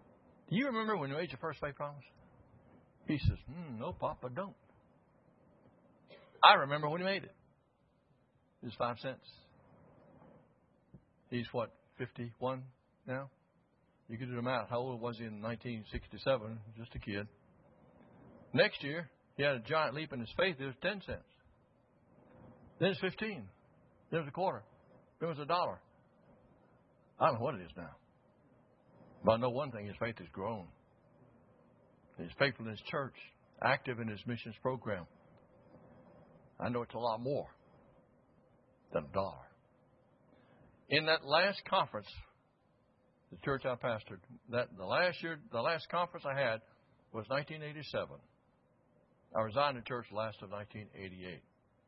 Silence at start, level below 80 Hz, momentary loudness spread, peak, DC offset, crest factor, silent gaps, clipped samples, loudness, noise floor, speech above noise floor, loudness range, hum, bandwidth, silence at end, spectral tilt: 0.5 s; -64 dBFS; 17 LU; -8 dBFS; under 0.1%; 32 dB; none; under 0.1%; -37 LUFS; -73 dBFS; 37 dB; 11 LU; none; 5.4 kHz; 0.5 s; -3 dB/octave